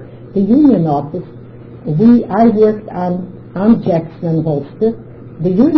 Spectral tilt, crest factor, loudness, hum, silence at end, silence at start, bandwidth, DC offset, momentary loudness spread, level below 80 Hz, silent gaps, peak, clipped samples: -11 dB/octave; 12 dB; -13 LUFS; none; 0 s; 0 s; 5.4 kHz; under 0.1%; 17 LU; -44 dBFS; none; 0 dBFS; under 0.1%